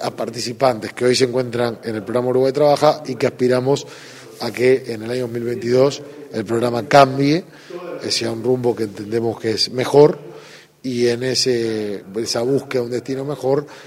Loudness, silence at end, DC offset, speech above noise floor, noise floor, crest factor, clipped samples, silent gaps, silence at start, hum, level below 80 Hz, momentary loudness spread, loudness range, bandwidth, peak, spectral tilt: -18 LUFS; 0 s; under 0.1%; 23 dB; -41 dBFS; 18 dB; under 0.1%; none; 0 s; none; -60 dBFS; 13 LU; 3 LU; 16 kHz; 0 dBFS; -5 dB/octave